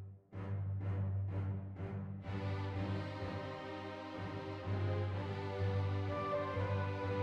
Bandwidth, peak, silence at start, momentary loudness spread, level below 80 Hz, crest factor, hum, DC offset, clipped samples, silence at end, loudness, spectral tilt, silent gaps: 6.4 kHz; -26 dBFS; 0 s; 7 LU; -66 dBFS; 12 dB; none; under 0.1%; under 0.1%; 0 s; -41 LUFS; -8.5 dB/octave; none